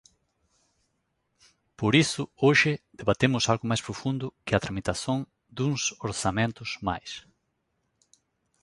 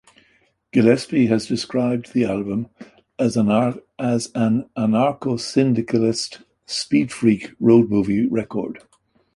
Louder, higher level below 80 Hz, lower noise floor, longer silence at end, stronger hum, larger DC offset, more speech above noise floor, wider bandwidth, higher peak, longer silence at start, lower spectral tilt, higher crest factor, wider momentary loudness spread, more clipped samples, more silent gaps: second, -27 LUFS vs -20 LUFS; about the same, -54 dBFS vs -56 dBFS; first, -76 dBFS vs -61 dBFS; first, 1.45 s vs 0.55 s; neither; neither; first, 50 dB vs 42 dB; about the same, 11.5 kHz vs 11.5 kHz; second, -6 dBFS vs -2 dBFS; first, 1.8 s vs 0.75 s; second, -4.5 dB/octave vs -6 dB/octave; about the same, 22 dB vs 18 dB; about the same, 10 LU vs 11 LU; neither; neither